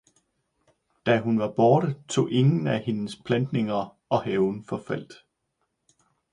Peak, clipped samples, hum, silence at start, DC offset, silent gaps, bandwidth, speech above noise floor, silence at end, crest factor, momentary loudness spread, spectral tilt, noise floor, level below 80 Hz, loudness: -6 dBFS; under 0.1%; none; 1.05 s; under 0.1%; none; 11 kHz; 53 dB; 1.2 s; 20 dB; 11 LU; -7 dB/octave; -77 dBFS; -64 dBFS; -25 LUFS